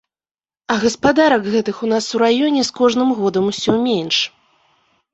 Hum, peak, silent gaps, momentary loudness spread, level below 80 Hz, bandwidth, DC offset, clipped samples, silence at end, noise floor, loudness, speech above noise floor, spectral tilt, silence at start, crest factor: none; -2 dBFS; none; 5 LU; -52 dBFS; 8.2 kHz; under 0.1%; under 0.1%; 0.85 s; under -90 dBFS; -16 LUFS; over 74 dB; -4 dB/octave; 0.7 s; 16 dB